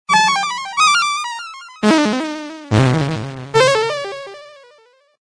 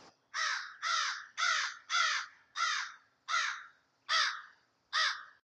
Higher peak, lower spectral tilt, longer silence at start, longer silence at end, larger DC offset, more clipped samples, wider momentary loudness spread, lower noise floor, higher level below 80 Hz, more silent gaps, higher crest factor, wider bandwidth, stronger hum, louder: first, -2 dBFS vs -16 dBFS; first, -4 dB/octave vs 4.5 dB/octave; about the same, 0.1 s vs 0 s; first, 0.7 s vs 0.25 s; neither; neither; about the same, 15 LU vs 14 LU; second, -52 dBFS vs -62 dBFS; first, -48 dBFS vs under -90 dBFS; neither; about the same, 16 dB vs 20 dB; about the same, 10.5 kHz vs 10 kHz; neither; first, -16 LUFS vs -33 LUFS